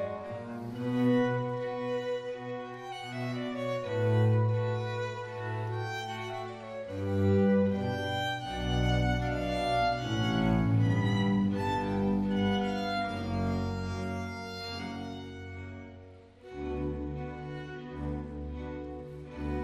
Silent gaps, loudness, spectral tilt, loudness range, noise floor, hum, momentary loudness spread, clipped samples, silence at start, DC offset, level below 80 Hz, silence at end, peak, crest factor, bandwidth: none; -32 LUFS; -7 dB/octave; 10 LU; -51 dBFS; none; 14 LU; under 0.1%; 0 s; under 0.1%; -46 dBFS; 0 s; -16 dBFS; 16 dB; 12.5 kHz